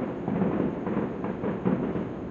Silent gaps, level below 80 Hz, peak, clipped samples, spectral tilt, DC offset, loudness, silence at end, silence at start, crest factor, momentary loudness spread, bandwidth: none; -52 dBFS; -12 dBFS; under 0.1%; -10 dB/octave; under 0.1%; -29 LUFS; 0 s; 0 s; 16 dB; 4 LU; 6.8 kHz